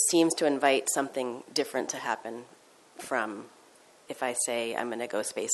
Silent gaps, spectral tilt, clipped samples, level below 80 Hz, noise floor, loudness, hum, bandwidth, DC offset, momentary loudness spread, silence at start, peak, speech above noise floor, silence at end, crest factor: none; -2 dB/octave; under 0.1%; -80 dBFS; -58 dBFS; -29 LUFS; none; 12.5 kHz; under 0.1%; 15 LU; 0 s; -8 dBFS; 28 dB; 0 s; 22 dB